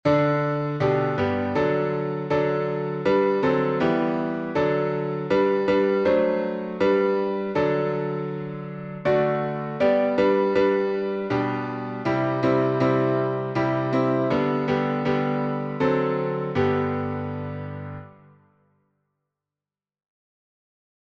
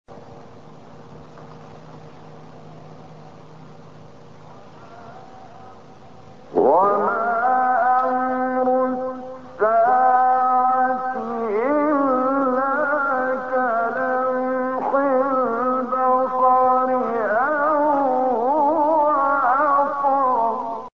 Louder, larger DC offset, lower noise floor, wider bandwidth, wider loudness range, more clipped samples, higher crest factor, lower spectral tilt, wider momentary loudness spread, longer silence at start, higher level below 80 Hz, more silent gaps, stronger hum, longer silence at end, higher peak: second, -23 LUFS vs -19 LUFS; second, under 0.1% vs 0.5%; first, under -90 dBFS vs -44 dBFS; about the same, 7 kHz vs 6.6 kHz; about the same, 5 LU vs 3 LU; neither; about the same, 16 dB vs 16 dB; about the same, -8.5 dB/octave vs -7.5 dB/octave; about the same, 8 LU vs 6 LU; about the same, 0.05 s vs 0.1 s; first, -58 dBFS vs -64 dBFS; neither; neither; first, 2.95 s vs 0.05 s; about the same, -8 dBFS vs -6 dBFS